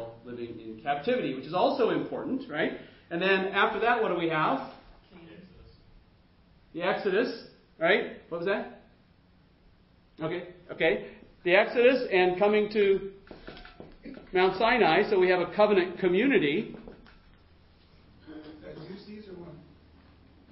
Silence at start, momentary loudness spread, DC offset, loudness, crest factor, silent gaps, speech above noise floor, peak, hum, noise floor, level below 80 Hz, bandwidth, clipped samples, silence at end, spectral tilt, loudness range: 0 s; 22 LU; under 0.1%; -27 LUFS; 22 dB; none; 35 dB; -6 dBFS; none; -61 dBFS; -60 dBFS; 5.8 kHz; under 0.1%; 0.9 s; -9.5 dB/octave; 9 LU